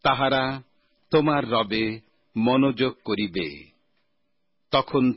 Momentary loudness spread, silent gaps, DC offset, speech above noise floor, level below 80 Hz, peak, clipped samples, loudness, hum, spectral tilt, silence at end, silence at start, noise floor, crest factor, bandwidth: 13 LU; none; under 0.1%; 55 dB; -56 dBFS; -8 dBFS; under 0.1%; -24 LUFS; none; -10.5 dB/octave; 0 s; 0.05 s; -77 dBFS; 16 dB; 5.8 kHz